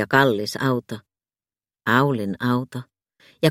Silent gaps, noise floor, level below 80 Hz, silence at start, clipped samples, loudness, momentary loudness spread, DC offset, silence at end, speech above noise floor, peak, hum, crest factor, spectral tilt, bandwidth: none; under -90 dBFS; -62 dBFS; 0 s; under 0.1%; -22 LUFS; 18 LU; under 0.1%; 0 s; over 69 dB; 0 dBFS; none; 22 dB; -6 dB/octave; 16.5 kHz